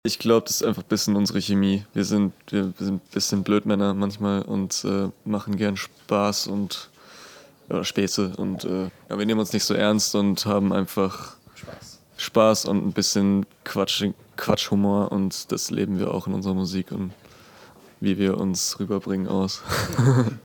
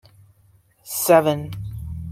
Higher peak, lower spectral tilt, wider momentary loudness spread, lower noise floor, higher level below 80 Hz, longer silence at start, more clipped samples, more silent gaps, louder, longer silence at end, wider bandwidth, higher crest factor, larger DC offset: about the same, -4 dBFS vs -2 dBFS; about the same, -5 dB/octave vs -5 dB/octave; second, 10 LU vs 16 LU; second, -49 dBFS vs -57 dBFS; second, -58 dBFS vs -44 dBFS; second, 0.05 s vs 0.85 s; neither; neither; second, -24 LUFS vs -19 LUFS; about the same, 0.05 s vs 0 s; first, 19 kHz vs 16.5 kHz; about the same, 20 dB vs 20 dB; neither